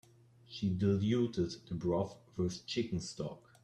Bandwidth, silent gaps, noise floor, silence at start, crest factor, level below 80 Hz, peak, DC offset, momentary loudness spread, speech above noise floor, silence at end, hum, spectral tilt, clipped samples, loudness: 11 kHz; none; -61 dBFS; 0.5 s; 16 dB; -64 dBFS; -20 dBFS; under 0.1%; 10 LU; 26 dB; 0.25 s; none; -6.5 dB/octave; under 0.1%; -36 LUFS